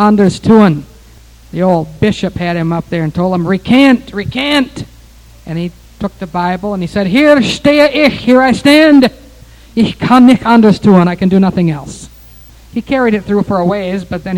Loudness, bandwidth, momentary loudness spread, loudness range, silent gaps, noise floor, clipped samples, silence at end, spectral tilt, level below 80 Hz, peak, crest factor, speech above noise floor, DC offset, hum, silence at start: -10 LUFS; 17.5 kHz; 15 LU; 6 LU; none; -38 dBFS; 0.8%; 0 s; -6.5 dB/octave; -38 dBFS; 0 dBFS; 10 dB; 29 dB; under 0.1%; none; 0 s